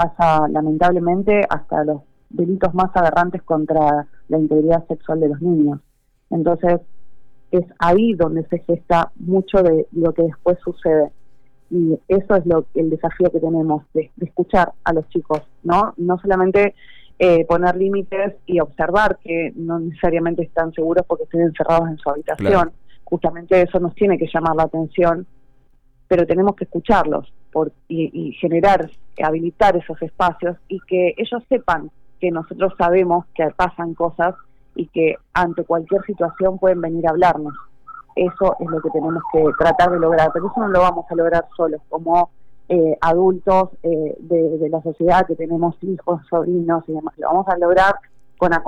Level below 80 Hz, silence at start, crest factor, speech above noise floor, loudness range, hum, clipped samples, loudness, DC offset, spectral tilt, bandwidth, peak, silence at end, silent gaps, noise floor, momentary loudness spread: -42 dBFS; 0 s; 12 dB; 35 dB; 2 LU; none; under 0.1%; -18 LUFS; under 0.1%; -8 dB/octave; 8.6 kHz; -6 dBFS; 0 s; none; -52 dBFS; 8 LU